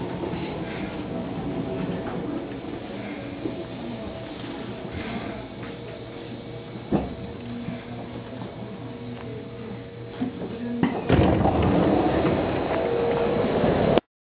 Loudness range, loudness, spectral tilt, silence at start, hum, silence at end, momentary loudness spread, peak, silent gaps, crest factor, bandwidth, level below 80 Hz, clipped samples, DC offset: 12 LU; -27 LUFS; -11 dB/octave; 0 s; none; 0.3 s; 15 LU; 0 dBFS; none; 26 dB; 5 kHz; -42 dBFS; under 0.1%; under 0.1%